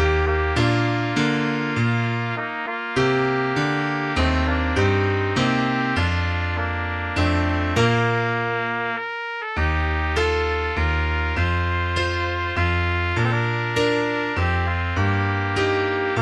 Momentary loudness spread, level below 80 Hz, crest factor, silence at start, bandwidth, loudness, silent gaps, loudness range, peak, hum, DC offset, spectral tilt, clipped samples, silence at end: 4 LU; -32 dBFS; 14 dB; 0 s; 10.5 kHz; -22 LUFS; none; 1 LU; -6 dBFS; none; under 0.1%; -6 dB/octave; under 0.1%; 0 s